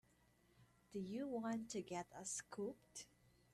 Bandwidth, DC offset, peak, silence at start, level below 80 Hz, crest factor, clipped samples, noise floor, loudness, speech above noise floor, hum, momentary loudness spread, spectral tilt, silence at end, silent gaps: 13.5 kHz; under 0.1%; -36 dBFS; 0.6 s; -80 dBFS; 14 dB; under 0.1%; -75 dBFS; -48 LUFS; 28 dB; 60 Hz at -75 dBFS; 11 LU; -4 dB/octave; 0.45 s; none